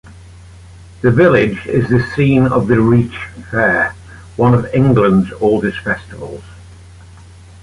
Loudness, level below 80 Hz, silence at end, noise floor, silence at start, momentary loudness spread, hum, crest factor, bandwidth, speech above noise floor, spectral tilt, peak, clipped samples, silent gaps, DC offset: -13 LUFS; -38 dBFS; 0.9 s; -38 dBFS; 0.05 s; 15 LU; none; 14 dB; 11 kHz; 25 dB; -8.5 dB/octave; -2 dBFS; under 0.1%; none; under 0.1%